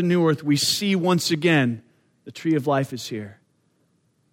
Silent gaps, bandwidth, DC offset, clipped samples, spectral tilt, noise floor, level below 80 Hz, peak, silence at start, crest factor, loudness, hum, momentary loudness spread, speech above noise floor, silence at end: none; 16.5 kHz; under 0.1%; under 0.1%; -5 dB/octave; -66 dBFS; -68 dBFS; -6 dBFS; 0 s; 16 dB; -22 LUFS; none; 15 LU; 45 dB; 1 s